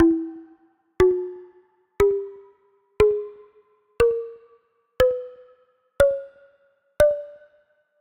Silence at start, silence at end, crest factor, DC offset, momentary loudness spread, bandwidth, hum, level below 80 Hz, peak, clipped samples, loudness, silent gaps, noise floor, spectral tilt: 0 s; 0.7 s; 20 dB; under 0.1%; 20 LU; 13 kHz; none; -44 dBFS; -4 dBFS; under 0.1%; -22 LUFS; none; -63 dBFS; -6.5 dB/octave